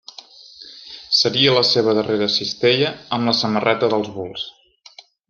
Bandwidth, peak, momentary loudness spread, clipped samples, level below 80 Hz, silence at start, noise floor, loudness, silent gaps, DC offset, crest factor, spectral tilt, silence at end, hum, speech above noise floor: 7.2 kHz; -2 dBFS; 22 LU; under 0.1%; -62 dBFS; 0.6 s; -47 dBFS; -17 LUFS; none; under 0.1%; 18 dB; -4.5 dB/octave; 0.8 s; none; 28 dB